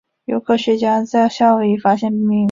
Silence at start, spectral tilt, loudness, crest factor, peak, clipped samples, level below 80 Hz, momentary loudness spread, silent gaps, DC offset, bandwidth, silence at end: 0.3 s; -6.5 dB/octave; -16 LUFS; 14 dB; -2 dBFS; under 0.1%; -60 dBFS; 4 LU; none; under 0.1%; 7.4 kHz; 0 s